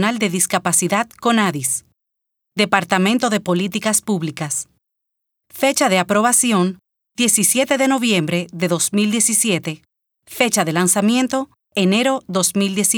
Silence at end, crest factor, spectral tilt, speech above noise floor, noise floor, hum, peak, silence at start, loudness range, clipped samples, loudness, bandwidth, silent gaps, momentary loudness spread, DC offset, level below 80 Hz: 0 s; 18 dB; -3 dB/octave; 58 dB; -75 dBFS; none; 0 dBFS; 0 s; 3 LU; under 0.1%; -17 LUFS; over 20 kHz; none; 9 LU; under 0.1%; -66 dBFS